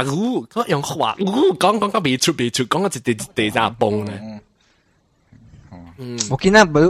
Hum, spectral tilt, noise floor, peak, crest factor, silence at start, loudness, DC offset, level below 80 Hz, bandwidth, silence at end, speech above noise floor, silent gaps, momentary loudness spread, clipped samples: none; -4.5 dB/octave; -61 dBFS; 0 dBFS; 18 dB; 0 s; -18 LUFS; under 0.1%; -48 dBFS; 15.5 kHz; 0 s; 43 dB; none; 11 LU; under 0.1%